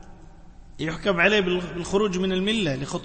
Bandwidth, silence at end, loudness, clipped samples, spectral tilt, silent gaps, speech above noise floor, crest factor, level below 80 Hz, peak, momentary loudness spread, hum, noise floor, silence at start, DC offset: 8.8 kHz; 0 s; -23 LUFS; under 0.1%; -5 dB/octave; none; 21 dB; 18 dB; -44 dBFS; -6 dBFS; 9 LU; none; -45 dBFS; 0 s; under 0.1%